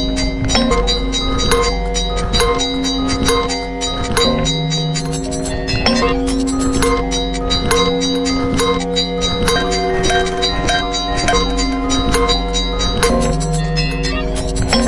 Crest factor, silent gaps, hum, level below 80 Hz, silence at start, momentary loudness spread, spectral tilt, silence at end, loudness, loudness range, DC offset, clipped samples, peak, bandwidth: 16 dB; none; none; -22 dBFS; 0 s; 5 LU; -4 dB/octave; 0 s; -16 LUFS; 1 LU; under 0.1%; under 0.1%; 0 dBFS; 11.5 kHz